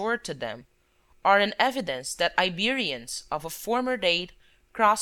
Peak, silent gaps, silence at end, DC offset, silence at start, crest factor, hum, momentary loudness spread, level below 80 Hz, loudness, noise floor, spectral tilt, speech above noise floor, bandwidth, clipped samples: -4 dBFS; none; 0 s; under 0.1%; 0 s; 22 dB; none; 13 LU; -58 dBFS; -26 LUFS; -62 dBFS; -2.5 dB/octave; 36 dB; 19.5 kHz; under 0.1%